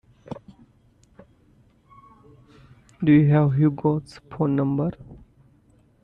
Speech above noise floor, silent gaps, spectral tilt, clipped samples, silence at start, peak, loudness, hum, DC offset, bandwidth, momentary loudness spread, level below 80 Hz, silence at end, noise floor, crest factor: 38 dB; none; -10 dB/octave; under 0.1%; 0.3 s; -8 dBFS; -21 LUFS; none; under 0.1%; 5.6 kHz; 23 LU; -56 dBFS; 0.9 s; -58 dBFS; 18 dB